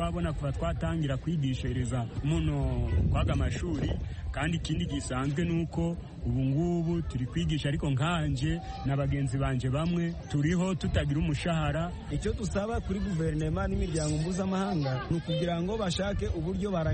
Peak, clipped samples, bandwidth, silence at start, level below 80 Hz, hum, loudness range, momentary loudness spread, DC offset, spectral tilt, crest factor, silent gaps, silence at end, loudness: -16 dBFS; under 0.1%; 8.8 kHz; 0 s; -38 dBFS; none; 1 LU; 4 LU; under 0.1%; -6.5 dB/octave; 14 dB; none; 0 s; -31 LUFS